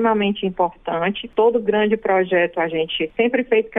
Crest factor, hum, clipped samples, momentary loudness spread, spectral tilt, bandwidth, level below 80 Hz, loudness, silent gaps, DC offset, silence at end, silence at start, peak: 14 dB; none; under 0.1%; 5 LU; -8.5 dB/octave; 3.8 kHz; -54 dBFS; -19 LUFS; none; under 0.1%; 0 s; 0 s; -6 dBFS